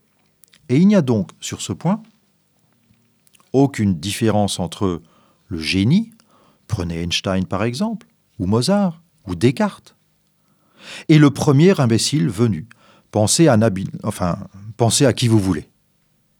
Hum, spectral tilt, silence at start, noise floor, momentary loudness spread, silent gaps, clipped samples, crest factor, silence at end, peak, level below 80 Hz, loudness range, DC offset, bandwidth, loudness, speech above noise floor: none; -5.5 dB/octave; 0.7 s; -62 dBFS; 14 LU; none; under 0.1%; 18 dB; 0.75 s; 0 dBFS; -50 dBFS; 6 LU; under 0.1%; 19.5 kHz; -18 LUFS; 45 dB